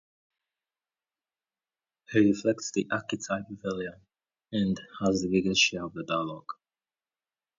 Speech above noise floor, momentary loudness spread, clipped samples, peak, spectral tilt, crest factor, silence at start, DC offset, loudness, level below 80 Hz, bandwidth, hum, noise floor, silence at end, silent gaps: over 62 dB; 13 LU; under 0.1%; -10 dBFS; -4 dB/octave; 22 dB; 2.1 s; under 0.1%; -28 LUFS; -62 dBFS; 7.6 kHz; none; under -90 dBFS; 1.05 s; none